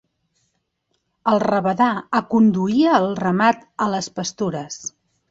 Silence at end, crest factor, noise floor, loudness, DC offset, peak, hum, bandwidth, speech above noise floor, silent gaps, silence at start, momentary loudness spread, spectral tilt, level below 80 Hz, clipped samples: 0.4 s; 18 dB; -72 dBFS; -19 LUFS; under 0.1%; -2 dBFS; none; 7.8 kHz; 53 dB; none; 1.25 s; 11 LU; -5.5 dB/octave; -62 dBFS; under 0.1%